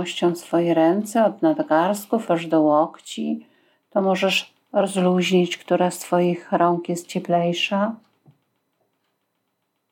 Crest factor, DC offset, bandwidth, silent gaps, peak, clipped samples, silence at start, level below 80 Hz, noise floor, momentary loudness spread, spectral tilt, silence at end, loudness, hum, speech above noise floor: 16 dB; under 0.1%; 17 kHz; none; -6 dBFS; under 0.1%; 0 s; -82 dBFS; -74 dBFS; 9 LU; -5.5 dB/octave; 1.95 s; -21 LUFS; none; 54 dB